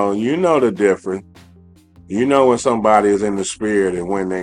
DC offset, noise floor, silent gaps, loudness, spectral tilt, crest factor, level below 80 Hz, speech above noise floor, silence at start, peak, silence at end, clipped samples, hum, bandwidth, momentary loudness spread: under 0.1%; -47 dBFS; none; -16 LUFS; -5.5 dB/octave; 16 dB; -52 dBFS; 31 dB; 0 s; 0 dBFS; 0 s; under 0.1%; none; 11 kHz; 8 LU